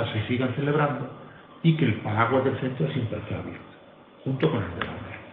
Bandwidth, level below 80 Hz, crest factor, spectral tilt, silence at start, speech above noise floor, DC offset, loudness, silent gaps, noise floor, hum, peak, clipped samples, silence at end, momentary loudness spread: 4.2 kHz; -56 dBFS; 20 dB; -10.5 dB/octave; 0 s; 25 dB; under 0.1%; -26 LUFS; none; -50 dBFS; none; -6 dBFS; under 0.1%; 0 s; 15 LU